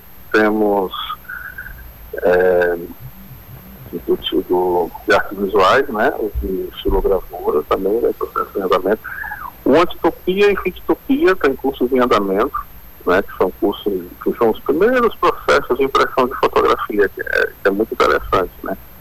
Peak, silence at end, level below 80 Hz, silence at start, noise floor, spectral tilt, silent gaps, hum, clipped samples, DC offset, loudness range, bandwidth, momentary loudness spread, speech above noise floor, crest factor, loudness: -4 dBFS; 0 s; -36 dBFS; 0.05 s; -37 dBFS; -5.5 dB/octave; none; none; under 0.1%; under 0.1%; 3 LU; 15.5 kHz; 14 LU; 21 dB; 12 dB; -17 LUFS